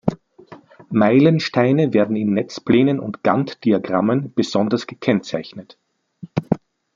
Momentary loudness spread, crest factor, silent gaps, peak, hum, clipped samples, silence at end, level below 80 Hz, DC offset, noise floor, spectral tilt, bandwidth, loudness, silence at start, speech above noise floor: 11 LU; 18 dB; none; -2 dBFS; none; under 0.1%; 0.4 s; -56 dBFS; under 0.1%; -44 dBFS; -7.5 dB/octave; 7.6 kHz; -19 LUFS; 0.05 s; 27 dB